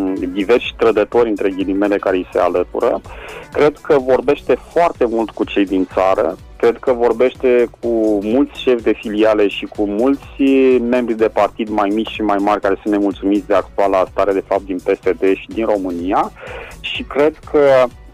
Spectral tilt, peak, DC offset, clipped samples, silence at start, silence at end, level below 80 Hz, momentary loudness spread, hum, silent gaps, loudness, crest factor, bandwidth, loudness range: -6 dB/octave; -4 dBFS; under 0.1%; under 0.1%; 0 s; 0.05 s; -42 dBFS; 6 LU; none; none; -16 LUFS; 12 dB; 14.5 kHz; 2 LU